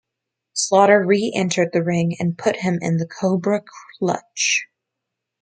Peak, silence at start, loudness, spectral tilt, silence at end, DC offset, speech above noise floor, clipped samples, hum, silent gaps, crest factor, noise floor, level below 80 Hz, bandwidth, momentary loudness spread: -2 dBFS; 0.55 s; -19 LUFS; -4.5 dB/octave; 0.75 s; under 0.1%; 63 dB; under 0.1%; none; none; 18 dB; -82 dBFS; -66 dBFS; 9.4 kHz; 9 LU